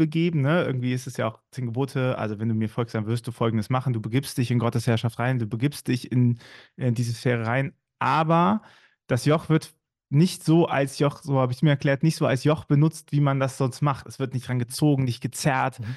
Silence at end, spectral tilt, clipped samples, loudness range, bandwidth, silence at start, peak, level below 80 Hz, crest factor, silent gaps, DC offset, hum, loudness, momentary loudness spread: 0 s; -6.5 dB/octave; under 0.1%; 4 LU; 12.5 kHz; 0 s; -10 dBFS; -62 dBFS; 14 dB; none; under 0.1%; none; -24 LUFS; 7 LU